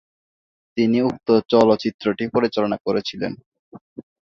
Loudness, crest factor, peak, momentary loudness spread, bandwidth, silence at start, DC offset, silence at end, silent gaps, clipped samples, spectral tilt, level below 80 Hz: -20 LUFS; 18 dB; -2 dBFS; 13 LU; 7.4 kHz; 0.75 s; under 0.1%; 0.2 s; 1.94-1.99 s, 3.46-3.52 s, 3.59-3.72 s, 3.81-3.96 s; under 0.1%; -6.5 dB/octave; -58 dBFS